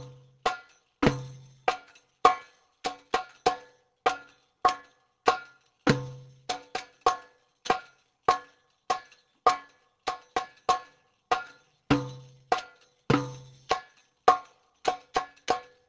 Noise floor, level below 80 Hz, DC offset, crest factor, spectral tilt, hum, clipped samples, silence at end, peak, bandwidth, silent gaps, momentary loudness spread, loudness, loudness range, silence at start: -57 dBFS; -58 dBFS; under 0.1%; 28 dB; -4.5 dB/octave; none; under 0.1%; 0.25 s; -2 dBFS; 8 kHz; none; 14 LU; -30 LUFS; 2 LU; 0 s